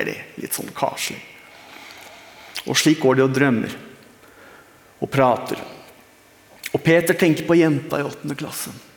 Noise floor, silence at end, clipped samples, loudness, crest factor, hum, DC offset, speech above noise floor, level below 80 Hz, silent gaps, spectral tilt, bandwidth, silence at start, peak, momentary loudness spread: -51 dBFS; 0.2 s; under 0.1%; -20 LUFS; 20 dB; none; under 0.1%; 31 dB; -60 dBFS; none; -5 dB/octave; over 20 kHz; 0 s; -2 dBFS; 23 LU